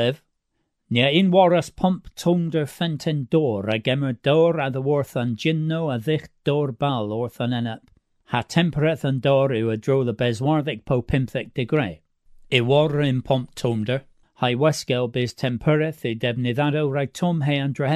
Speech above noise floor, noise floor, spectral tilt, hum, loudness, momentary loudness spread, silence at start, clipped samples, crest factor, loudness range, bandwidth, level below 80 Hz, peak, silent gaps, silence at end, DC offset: 53 dB; -74 dBFS; -6.5 dB/octave; none; -22 LUFS; 7 LU; 0 s; under 0.1%; 20 dB; 3 LU; 14 kHz; -50 dBFS; -2 dBFS; none; 0 s; under 0.1%